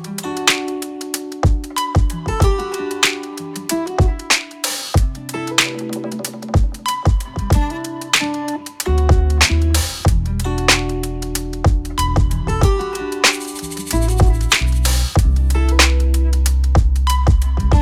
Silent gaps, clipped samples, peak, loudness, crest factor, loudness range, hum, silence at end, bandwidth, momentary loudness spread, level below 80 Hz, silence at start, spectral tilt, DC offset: none; under 0.1%; 0 dBFS; -18 LUFS; 16 dB; 4 LU; none; 0 s; 16 kHz; 10 LU; -18 dBFS; 0 s; -4 dB/octave; under 0.1%